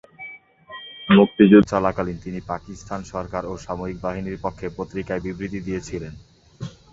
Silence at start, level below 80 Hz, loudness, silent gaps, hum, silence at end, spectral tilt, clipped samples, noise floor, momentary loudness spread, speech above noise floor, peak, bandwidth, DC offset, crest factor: 0.2 s; -46 dBFS; -21 LUFS; none; none; 0.2 s; -7 dB/octave; under 0.1%; -42 dBFS; 23 LU; 21 dB; -2 dBFS; 7.8 kHz; under 0.1%; 20 dB